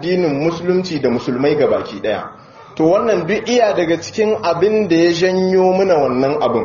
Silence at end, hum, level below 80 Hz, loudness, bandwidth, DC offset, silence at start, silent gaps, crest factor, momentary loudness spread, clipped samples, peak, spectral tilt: 0 s; none; -50 dBFS; -15 LUFS; 7.2 kHz; under 0.1%; 0 s; none; 14 dB; 6 LU; under 0.1%; 0 dBFS; -5 dB/octave